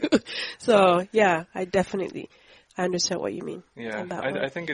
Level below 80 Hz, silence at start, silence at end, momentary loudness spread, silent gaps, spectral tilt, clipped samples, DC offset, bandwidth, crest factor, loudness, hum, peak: -60 dBFS; 0 s; 0 s; 17 LU; none; -4 dB/octave; under 0.1%; under 0.1%; 11 kHz; 20 dB; -25 LUFS; none; -6 dBFS